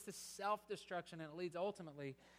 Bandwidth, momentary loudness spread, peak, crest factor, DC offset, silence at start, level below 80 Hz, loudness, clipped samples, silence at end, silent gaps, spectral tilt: 15.5 kHz; 8 LU; -30 dBFS; 18 dB; under 0.1%; 0 s; -82 dBFS; -47 LUFS; under 0.1%; 0 s; none; -4.5 dB/octave